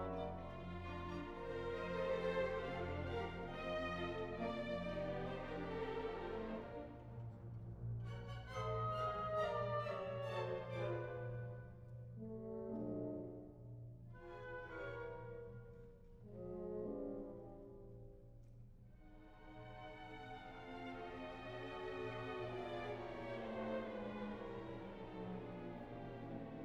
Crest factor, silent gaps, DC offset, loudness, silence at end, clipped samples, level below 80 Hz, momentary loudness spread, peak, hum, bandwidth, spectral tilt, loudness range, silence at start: 18 dB; none; under 0.1%; -47 LUFS; 0 s; under 0.1%; -60 dBFS; 15 LU; -30 dBFS; none; 9.6 kHz; -7.5 dB/octave; 9 LU; 0 s